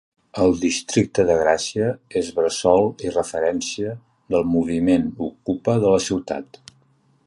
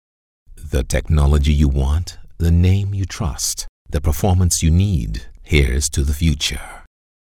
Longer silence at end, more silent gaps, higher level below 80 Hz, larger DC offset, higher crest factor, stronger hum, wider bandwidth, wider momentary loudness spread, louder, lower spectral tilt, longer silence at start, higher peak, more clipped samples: first, 0.8 s vs 0.5 s; second, none vs 3.69-3.85 s; second, -48 dBFS vs -22 dBFS; neither; about the same, 20 dB vs 18 dB; neither; second, 11.5 kHz vs 17 kHz; about the same, 10 LU vs 11 LU; second, -21 LUFS vs -18 LUFS; about the same, -5 dB/octave vs -5 dB/octave; second, 0.35 s vs 0.5 s; about the same, -2 dBFS vs 0 dBFS; neither